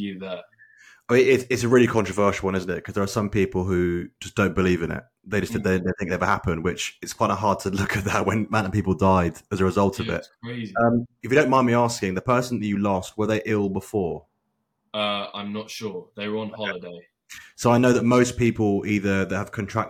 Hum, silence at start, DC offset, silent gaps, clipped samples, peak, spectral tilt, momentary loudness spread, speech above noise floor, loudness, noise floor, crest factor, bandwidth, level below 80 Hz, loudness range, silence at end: none; 0 s; under 0.1%; none; under 0.1%; -6 dBFS; -6 dB/octave; 13 LU; 52 dB; -23 LUFS; -75 dBFS; 18 dB; 16.5 kHz; -50 dBFS; 6 LU; 0 s